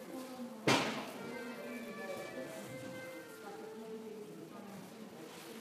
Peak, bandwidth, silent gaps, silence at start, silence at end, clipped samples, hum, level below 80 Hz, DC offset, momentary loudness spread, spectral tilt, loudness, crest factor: -16 dBFS; 15.5 kHz; none; 0 s; 0 s; under 0.1%; none; -82 dBFS; under 0.1%; 17 LU; -4 dB/octave; -42 LUFS; 26 dB